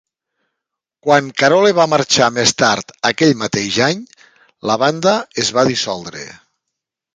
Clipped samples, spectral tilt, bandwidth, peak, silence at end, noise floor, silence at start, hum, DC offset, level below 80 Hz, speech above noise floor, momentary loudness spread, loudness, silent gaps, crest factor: under 0.1%; -3.5 dB/octave; 9.6 kHz; 0 dBFS; 0.8 s; -80 dBFS; 1.05 s; none; under 0.1%; -56 dBFS; 65 dB; 14 LU; -15 LUFS; none; 16 dB